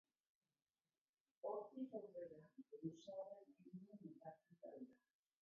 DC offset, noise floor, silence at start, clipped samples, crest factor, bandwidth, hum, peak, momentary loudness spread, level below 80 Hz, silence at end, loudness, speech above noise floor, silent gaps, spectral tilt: under 0.1%; under -90 dBFS; 1.45 s; under 0.1%; 20 dB; 4.9 kHz; none; -38 dBFS; 12 LU; under -90 dBFS; 0.45 s; -56 LUFS; over 33 dB; none; -7.5 dB/octave